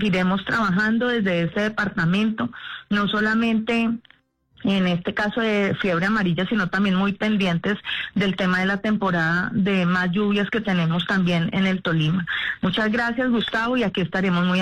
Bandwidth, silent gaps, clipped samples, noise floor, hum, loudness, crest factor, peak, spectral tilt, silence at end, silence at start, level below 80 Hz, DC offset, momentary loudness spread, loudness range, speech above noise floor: 9.2 kHz; none; under 0.1%; -57 dBFS; none; -22 LUFS; 8 dB; -12 dBFS; -6.5 dB/octave; 0 s; 0 s; -52 dBFS; under 0.1%; 4 LU; 2 LU; 35 dB